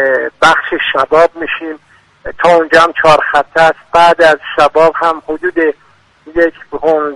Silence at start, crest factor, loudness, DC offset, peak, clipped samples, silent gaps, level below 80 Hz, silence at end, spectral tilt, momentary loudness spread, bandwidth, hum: 0 s; 10 dB; -10 LUFS; under 0.1%; 0 dBFS; 0.3%; none; -42 dBFS; 0 s; -4 dB/octave; 12 LU; 11.5 kHz; none